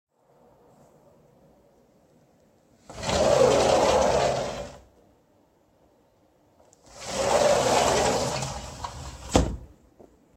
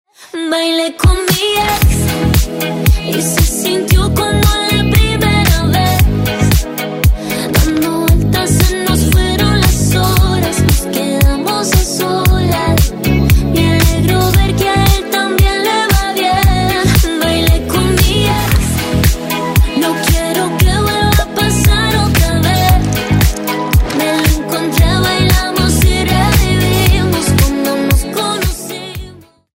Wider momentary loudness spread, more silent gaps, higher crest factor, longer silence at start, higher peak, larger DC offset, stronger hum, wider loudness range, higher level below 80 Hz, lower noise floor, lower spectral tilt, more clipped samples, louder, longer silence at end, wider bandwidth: first, 18 LU vs 4 LU; neither; first, 24 dB vs 12 dB; first, 2.9 s vs 0.2 s; second, -4 dBFS vs 0 dBFS; neither; neither; first, 7 LU vs 1 LU; second, -42 dBFS vs -16 dBFS; first, -63 dBFS vs -36 dBFS; about the same, -4 dB/octave vs -5 dB/octave; neither; second, -23 LUFS vs -12 LUFS; first, 0.7 s vs 0.4 s; about the same, 16 kHz vs 16.5 kHz